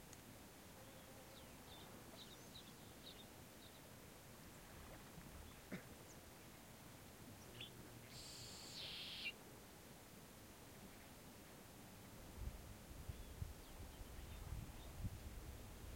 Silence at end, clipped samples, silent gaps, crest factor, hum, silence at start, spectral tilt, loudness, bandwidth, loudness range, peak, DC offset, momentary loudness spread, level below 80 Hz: 0 s; under 0.1%; none; 20 dB; none; 0 s; -3.5 dB/octave; -56 LUFS; 16.5 kHz; 5 LU; -36 dBFS; under 0.1%; 8 LU; -62 dBFS